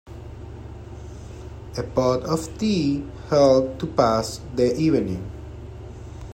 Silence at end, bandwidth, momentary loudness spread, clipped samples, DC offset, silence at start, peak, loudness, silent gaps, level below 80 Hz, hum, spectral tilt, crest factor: 0 s; 16.5 kHz; 20 LU; under 0.1%; under 0.1%; 0.05 s; -4 dBFS; -22 LUFS; none; -42 dBFS; none; -6.5 dB/octave; 20 dB